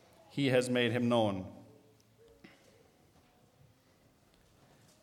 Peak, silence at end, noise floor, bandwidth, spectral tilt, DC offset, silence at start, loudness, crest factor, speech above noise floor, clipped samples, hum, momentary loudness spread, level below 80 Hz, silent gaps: -14 dBFS; 3.4 s; -67 dBFS; 15 kHz; -5.5 dB/octave; under 0.1%; 0.35 s; -32 LUFS; 22 dB; 36 dB; under 0.1%; none; 17 LU; -76 dBFS; none